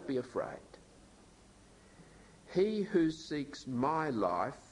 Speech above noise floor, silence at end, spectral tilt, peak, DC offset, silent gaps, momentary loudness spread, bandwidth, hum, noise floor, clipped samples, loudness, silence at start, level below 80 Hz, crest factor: 26 dB; 0.1 s; -6.5 dB/octave; -18 dBFS; under 0.1%; none; 9 LU; 11 kHz; none; -60 dBFS; under 0.1%; -35 LUFS; 0 s; -66 dBFS; 18 dB